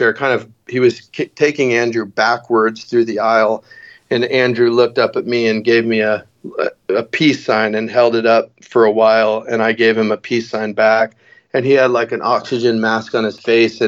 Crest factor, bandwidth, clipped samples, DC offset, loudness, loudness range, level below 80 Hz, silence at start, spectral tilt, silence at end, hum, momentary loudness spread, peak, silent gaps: 14 dB; 7.6 kHz; under 0.1%; under 0.1%; -15 LUFS; 2 LU; -68 dBFS; 0 s; -5.5 dB/octave; 0 s; none; 8 LU; 0 dBFS; none